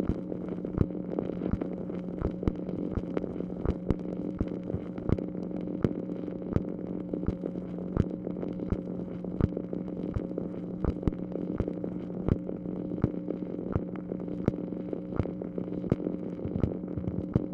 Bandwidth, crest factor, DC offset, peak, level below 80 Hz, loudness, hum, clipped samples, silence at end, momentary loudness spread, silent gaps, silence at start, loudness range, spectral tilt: 6 kHz; 22 dB; under 0.1%; -10 dBFS; -44 dBFS; -34 LUFS; none; under 0.1%; 0 s; 5 LU; none; 0 s; 1 LU; -11 dB/octave